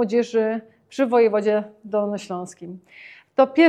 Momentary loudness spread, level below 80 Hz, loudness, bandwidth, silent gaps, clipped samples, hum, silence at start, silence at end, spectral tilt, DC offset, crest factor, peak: 21 LU; -78 dBFS; -22 LUFS; 9.8 kHz; none; under 0.1%; none; 0 s; 0 s; -6 dB/octave; under 0.1%; 18 dB; -2 dBFS